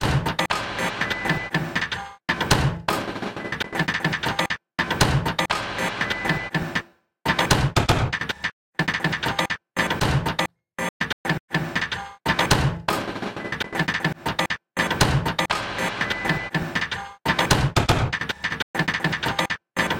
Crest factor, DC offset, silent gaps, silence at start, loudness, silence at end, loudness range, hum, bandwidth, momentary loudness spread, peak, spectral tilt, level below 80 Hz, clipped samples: 20 dB; under 0.1%; 8.53-8.73 s, 10.89-11.00 s, 11.13-11.24 s, 11.40-11.48 s, 18.62-18.74 s; 0 s; -24 LUFS; 0 s; 2 LU; none; 17 kHz; 8 LU; -4 dBFS; -4 dB/octave; -40 dBFS; under 0.1%